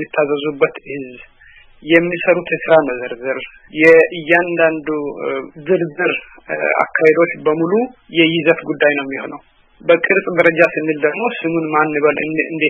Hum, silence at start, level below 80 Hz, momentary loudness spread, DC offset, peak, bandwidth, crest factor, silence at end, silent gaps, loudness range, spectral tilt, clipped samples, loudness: none; 0 s; -56 dBFS; 13 LU; under 0.1%; 0 dBFS; 6.6 kHz; 16 dB; 0 s; none; 3 LU; -7 dB/octave; under 0.1%; -15 LUFS